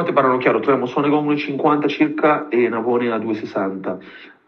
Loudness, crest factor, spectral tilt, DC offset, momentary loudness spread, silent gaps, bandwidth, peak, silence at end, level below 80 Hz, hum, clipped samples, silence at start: -19 LUFS; 18 dB; -8 dB/octave; under 0.1%; 8 LU; none; 6.4 kHz; -2 dBFS; 0.2 s; -72 dBFS; none; under 0.1%; 0 s